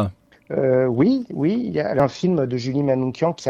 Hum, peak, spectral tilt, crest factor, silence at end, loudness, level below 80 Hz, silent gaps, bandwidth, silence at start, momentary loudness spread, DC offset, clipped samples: none; -4 dBFS; -7.5 dB/octave; 18 dB; 0 s; -21 LUFS; -56 dBFS; none; 8.8 kHz; 0 s; 5 LU; under 0.1%; under 0.1%